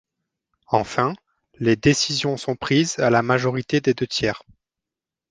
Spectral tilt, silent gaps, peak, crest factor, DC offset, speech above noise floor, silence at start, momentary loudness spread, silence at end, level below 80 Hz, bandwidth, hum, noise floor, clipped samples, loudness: -4.5 dB/octave; none; -2 dBFS; 20 dB; under 0.1%; 67 dB; 0.7 s; 8 LU; 0.9 s; -52 dBFS; 10 kHz; none; -88 dBFS; under 0.1%; -21 LUFS